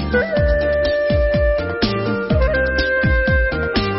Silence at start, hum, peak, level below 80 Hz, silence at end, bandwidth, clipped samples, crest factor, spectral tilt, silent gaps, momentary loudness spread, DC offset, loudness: 0 s; none; -4 dBFS; -22 dBFS; 0 s; 6 kHz; under 0.1%; 14 dB; -9.5 dB/octave; none; 3 LU; under 0.1%; -17 LUFS